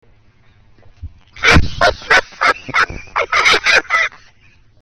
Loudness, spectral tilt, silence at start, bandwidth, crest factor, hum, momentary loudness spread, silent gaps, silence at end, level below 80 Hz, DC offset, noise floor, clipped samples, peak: -13 LUFS; -3 dB/octave; 1 s; 17 kHz; 16 dB; none; 6 LU; none; 0.65 s; -28 dBFS; under 0.1%; -50 dBFS; under 0.1%; 0 dBFS